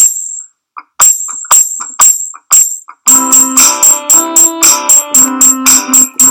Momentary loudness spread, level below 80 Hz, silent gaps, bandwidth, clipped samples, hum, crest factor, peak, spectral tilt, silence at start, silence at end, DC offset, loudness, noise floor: 9 LU; -50 dBFS; none; over 20 kHz; 5%; none; 8 dB; 0 dBFS; 1 dB/octave; 0 s; 0 s; under 0.1%; -5 LUFS; -34 dBFS